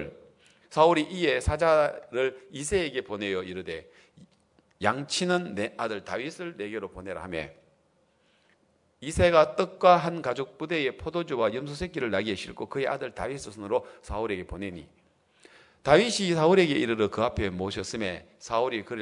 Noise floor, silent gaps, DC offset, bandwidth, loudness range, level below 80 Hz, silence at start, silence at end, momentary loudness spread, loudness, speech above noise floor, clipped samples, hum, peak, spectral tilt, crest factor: -67 dBFS; none; under 0.1%; 11 kHz; 8 LU; -50 dBFS; 0 s; 0 s; 15 LU; -27 LUFS; 40 dB; under 0.1%; none; -4 dBFS; -5 dB/octave; 24 dB